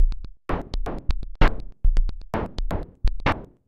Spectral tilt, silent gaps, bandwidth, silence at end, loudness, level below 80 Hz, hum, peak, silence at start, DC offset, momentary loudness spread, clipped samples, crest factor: -7 dB/octave; none; 6.2 kHz; 0.25 s; -29 LUFS; -24 dBFS; none; -4 dBFS; 0 s; under 0.1%; 8 LU; under 0.1%; 18 dB